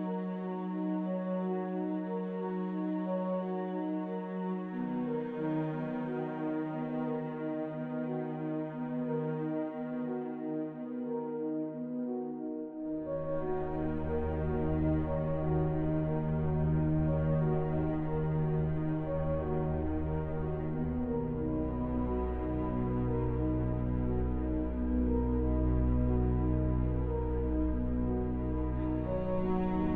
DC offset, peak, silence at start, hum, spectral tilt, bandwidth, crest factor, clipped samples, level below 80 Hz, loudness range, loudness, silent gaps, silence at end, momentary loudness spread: under 0.1%; -18 dBFS; 0 s; none; -12 dB/octave; 3.9 kHz; 14 dB; under 0.1%; -40 dBFS; 5 LU; -34 LUFS; none; 0 s; 6 LU